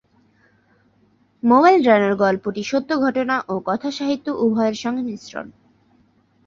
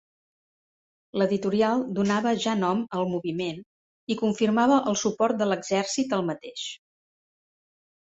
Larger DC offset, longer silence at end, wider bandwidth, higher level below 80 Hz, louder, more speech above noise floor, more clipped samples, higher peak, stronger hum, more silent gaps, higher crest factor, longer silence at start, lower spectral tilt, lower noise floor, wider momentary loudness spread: neither; second, 0.95 s vs 1.35 s; about the same, 7.6 kHz vs 8.2 kHz; first, -62 dBFS vs -68 dBFS; first, -19 LUFS vs -25 LUFS; second, 41 dB vs over 65 dB; neither; first, -2 dBFS vs -8 dBFS; neither; second, none vs 3.66-4.07 s; about the same, 18 dB vs 18 dB; first, 1.45 s vs 1.15 s; about the same, -5.5 dB/octave vs -5 dB/octave; second, -59 dBFS vs under -90 dBFS; first, 15 LU vs 12 LU